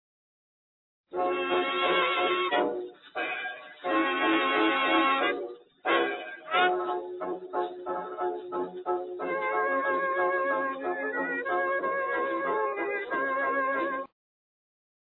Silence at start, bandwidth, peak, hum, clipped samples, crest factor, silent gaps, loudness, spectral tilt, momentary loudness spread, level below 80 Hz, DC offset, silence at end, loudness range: 1.1 s; 4.2 kHz; -12 dBFS; none; under 0.1%; 18 dB; none; -28 LUFS; -6.5 dB/octave; 11 LU; -74 dBFS; under 0.1%; 1.1 s; 4 LU